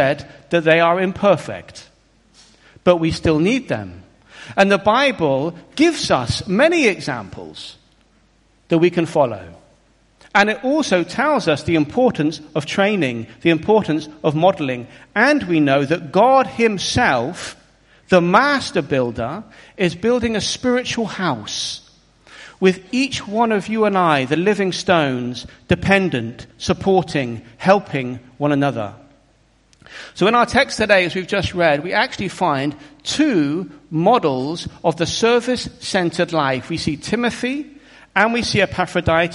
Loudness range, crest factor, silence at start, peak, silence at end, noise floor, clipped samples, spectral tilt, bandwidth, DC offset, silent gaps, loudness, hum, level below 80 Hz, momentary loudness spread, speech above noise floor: 4 LU; 18 dB; 0 s; 0 dBFS; 0 s; -56 dBFS; under 0.1%; -5 dB/octave; 11.5 kHz; under 0.1%; none; -18 LUFS; none; -46 dBFS; 11 LU; 39 dB